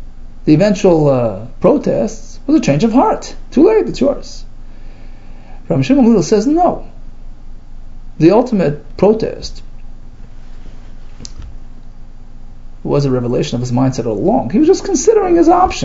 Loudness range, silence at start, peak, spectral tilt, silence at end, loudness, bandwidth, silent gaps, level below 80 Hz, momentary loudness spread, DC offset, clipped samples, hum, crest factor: 8 LU; 0 s; 0 dBFS; -6.5 dB/octave; 0 s; -13 LUFS; 7.8 kHz; none; -28 dBFS; 16 LU; under 0.1%; under 0.1%; 60 Hz at -40 dBFS; 14 dB